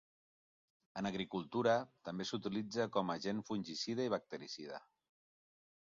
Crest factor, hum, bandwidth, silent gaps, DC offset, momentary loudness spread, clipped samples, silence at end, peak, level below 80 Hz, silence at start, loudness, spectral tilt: 20 dB; none; 7.4 kHz; none; under 0.1%; 12 LU; under 0.1%; 1.15 s; -20 dBFS; -78 dBFS; 0.95 s; -40 LUFS; -4 dB/octave